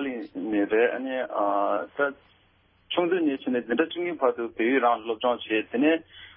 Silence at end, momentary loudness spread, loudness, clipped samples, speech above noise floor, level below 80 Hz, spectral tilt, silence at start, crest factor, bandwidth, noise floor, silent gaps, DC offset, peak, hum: 0.05 s; 6 LU; -26 LUFS; under 0.1%; 37 dB; -68 dBFS; -9 dB/octave; 0 s; 18 dB; 4.1 kHz; -63 dBFS; none; under 0.1%; -8 dBFS; none